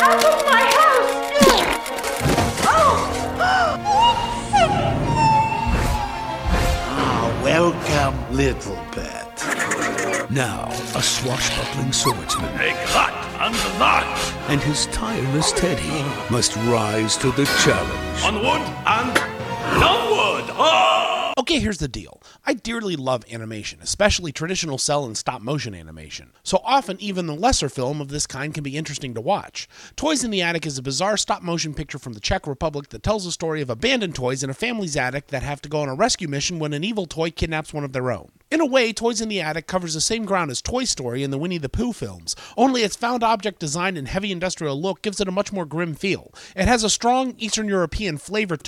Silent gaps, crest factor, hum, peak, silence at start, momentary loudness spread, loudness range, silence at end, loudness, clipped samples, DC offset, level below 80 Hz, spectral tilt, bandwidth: none; 20 dB; none; 0 dBFS; 0 s; 11 LU; 6 LU; 0 s; -21 LUFS; under 0.1%; under 0.1%; -36 dBFS; -3.5 dB/octave; 16.5 kHz